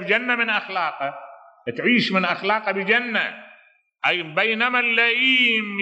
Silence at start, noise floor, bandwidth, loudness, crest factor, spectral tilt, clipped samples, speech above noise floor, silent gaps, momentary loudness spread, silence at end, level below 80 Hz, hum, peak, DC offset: 0 s; -55 dBFS; 8.4 kHz; -20 LUFS; 18 dB; -5 dB/octave; under 0.1%; 34 dB; none; 12 LU; 0 s; -78 dBFS; none; -4 dBFS; under 0.1%